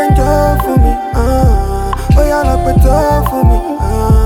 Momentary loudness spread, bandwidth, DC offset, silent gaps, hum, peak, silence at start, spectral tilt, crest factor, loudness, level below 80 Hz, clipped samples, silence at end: 5 LU; 17 kHz; under 0.1%; none; none; 0 dBFS; 0 s; -7.5 dB/octave; 10 dB; -12 LUFS; -12 dBFS; under 0.1%; 0 s